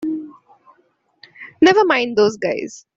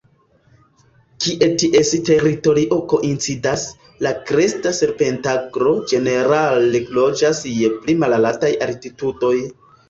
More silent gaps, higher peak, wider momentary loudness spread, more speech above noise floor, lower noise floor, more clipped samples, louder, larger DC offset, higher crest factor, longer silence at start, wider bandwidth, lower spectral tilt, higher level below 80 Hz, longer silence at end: neither; about the same, -2 dBFS vs -2 dBFS; first, 20 LU vs 8 LU; first, 46 dB vs 39 dB; first, -61 dBFS vs -56 dBFS; neither; about the same, -16 LUFS vs -17 LUFS; neither; about the same, 18 dB vs 16 dB; second, 0 s vs 1.2 s; about the same, 7.8 kHz vs 8 kHz; about the same, -4.5 dB/octave vs -4.5 dB/octave; second, -60 dBFS vs -52 dBFS; second, 0.15 s vs 0.35 s